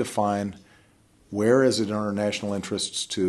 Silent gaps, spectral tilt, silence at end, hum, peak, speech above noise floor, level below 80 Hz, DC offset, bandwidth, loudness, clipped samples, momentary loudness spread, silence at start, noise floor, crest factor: none; -4.5 dB/octave; 0 s; none; -8 dBFS; 34 dB; -64 dBFS; under 0.1%; 12.5 kHz; -25 LUFS; under 0.1%; 9 LU; 0 s; -59 dBFS; 18 dB